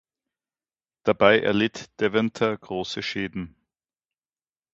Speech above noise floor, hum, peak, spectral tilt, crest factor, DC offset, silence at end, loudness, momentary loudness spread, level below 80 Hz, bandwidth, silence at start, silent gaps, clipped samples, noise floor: over 67 dB; none; -2 dBFS; -5.5 dB/octave; 24 dB; under 0.1%; 1.25 s; -24 LUFS; 13 LU; -58 dBFS; 8 kHz; 1.05 s; none; under 0.1%; under -90 dBFS